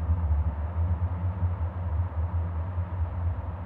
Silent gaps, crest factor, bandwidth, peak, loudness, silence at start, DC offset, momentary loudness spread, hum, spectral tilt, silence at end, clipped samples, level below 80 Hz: none; 12 dB; 3 kHz; -16 dBFS; -30 LUFS; 0 s; under 0.1%; 4 LU; none; -11.5 dB/octave; 0 s; under 0.1%; -32 dBFS